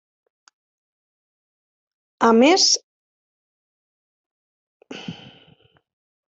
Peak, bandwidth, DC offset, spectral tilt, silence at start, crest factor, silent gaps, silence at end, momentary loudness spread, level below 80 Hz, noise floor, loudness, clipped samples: -2 dBFS; 8.2 kHz; under 0.1%; -2 dB/octave; 2.2 s; 22 dB; 2.83-4.80 s; 1.25 s; 23 LU; -70 dBFS; -57 dBFS; -16 LUFS; under 0.1%